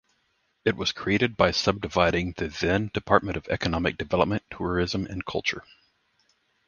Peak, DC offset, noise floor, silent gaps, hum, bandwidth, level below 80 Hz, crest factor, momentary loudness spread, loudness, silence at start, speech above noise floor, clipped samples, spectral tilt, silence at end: -2 dBFS; under 0.1%; -71 dBFS; none; none; 7.2 kHz; -44 dBFS; 26 dB; 8 LU; -26 LUFS; 0.65 s; 46 dB; under 0.1%; -5 dB/octave; 1.05 s